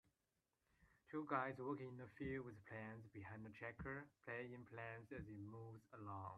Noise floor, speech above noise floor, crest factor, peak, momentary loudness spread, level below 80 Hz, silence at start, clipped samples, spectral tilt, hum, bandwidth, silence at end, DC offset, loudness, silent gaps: under -90 dBFS; over 38 dB; 24 dB; -30 dBFS; 11 LU; -74 dBFS; 0.8 s; under 0.1%; -8.5 dB/octave; none; 11.5 kHz; 0 s; under 0.1%; -52 LUFS; none